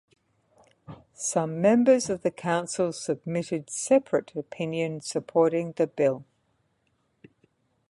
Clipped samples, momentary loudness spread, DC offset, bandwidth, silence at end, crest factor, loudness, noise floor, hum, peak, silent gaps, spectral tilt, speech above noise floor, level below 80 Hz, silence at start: under 0.1%; 10 LU; under 0.1%; 11.5 kHz; 1.65 s; 20 dB; -26 LUFS; -72 dBFS; none; -8 dBFS; none; -5 dB/octave; 46 dB; -68 dBFS; 0.9 s